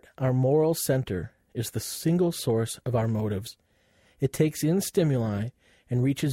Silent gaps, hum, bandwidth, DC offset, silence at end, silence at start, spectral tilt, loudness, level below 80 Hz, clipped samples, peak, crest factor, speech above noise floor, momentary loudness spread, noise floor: none; none; 16 kHz; under 0.1%; 0 s; 0.2 s; -6 dB/octave; -27 LUFS; -56 dBFS; under 0.1%; -10 dBFS; 16 dB; 38 dB; 11 LU; -64 dBFS